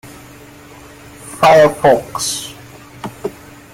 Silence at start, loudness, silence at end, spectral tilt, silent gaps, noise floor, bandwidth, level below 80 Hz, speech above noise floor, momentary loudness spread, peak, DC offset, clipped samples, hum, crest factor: 1.25 s; -12 LUFS; 0.4 s; -3.5 dB/octave; none; -38 dBFS; 16.5 kHz; -48 dBFS; 27 dB; 23 LU; 0 dBFS; under 0.1%; under 0.1%; none; 16 dB